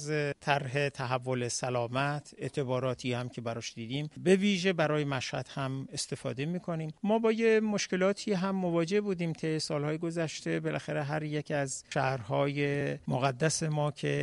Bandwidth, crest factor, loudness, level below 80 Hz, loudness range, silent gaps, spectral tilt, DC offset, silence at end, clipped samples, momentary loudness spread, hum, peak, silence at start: 11.5 kHz; 20 dB; -31 LUFS; -66 dBFS; 3 LU; none; -5 dB/octave; under 0.1%; 0 s; under 0.1%; 8 LU; none; -10 dBFS; 0 s